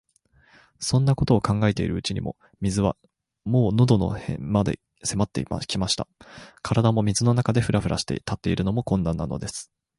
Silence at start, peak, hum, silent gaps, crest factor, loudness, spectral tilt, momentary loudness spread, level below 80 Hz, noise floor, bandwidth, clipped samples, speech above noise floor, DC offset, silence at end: 0.8 s; -4 dBFS; none; none; 20 dB; -24 LUFS; -6 dB/octave; 11 LU; -42 dBFS; -60 dBFS; 11.5 kHz; under 0.1%; 37 dB; under 0.1%; 0.35 s